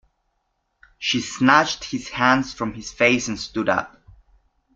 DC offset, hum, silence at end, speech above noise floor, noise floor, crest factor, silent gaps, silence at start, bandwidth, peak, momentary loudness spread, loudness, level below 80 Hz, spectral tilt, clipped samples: under 0.1%; none; 0.85 s; 52 dB; -73 dBFS; 22 dB; none; 1 s; 7.8 kHz; -2 dBFS; 12 LU; -21 LUFS; -52 dBFS; -3.5 dB/octave; under 0.1%